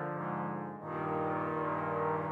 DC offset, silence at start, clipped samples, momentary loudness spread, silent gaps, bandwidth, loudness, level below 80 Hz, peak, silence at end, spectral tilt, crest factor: under 0.1%; 0 s; under 0.1%; 5 LU; none; 4.9 kHz; -36 LUFS; -86 dBFS; -22 dBFS; 0 s; -9.5 dB/octave; 14 dB